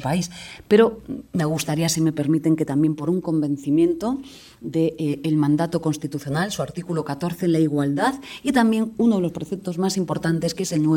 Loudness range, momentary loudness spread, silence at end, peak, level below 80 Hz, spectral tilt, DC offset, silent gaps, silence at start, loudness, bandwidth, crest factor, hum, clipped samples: 2 LU; 9 LU; 0 s; -4 dBFS; -54 dBFS; -6 dB/octave; under 0.1%; none; 0 s; -22 LUFS; 17 kHz; 18 dB; none; under 0.1%